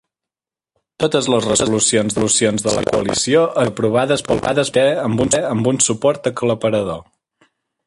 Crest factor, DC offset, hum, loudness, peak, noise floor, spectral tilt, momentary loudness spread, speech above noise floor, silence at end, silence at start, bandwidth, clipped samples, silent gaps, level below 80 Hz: 16 dB; under 0.1%; none; -16 LUFS; -2 dBFS; -89 dBFS; -4 dB/octave; 4 LU; 73 dB; 0.85 s; 1 s; 11.5 kHz; under 0.1%; none; -46 dBFS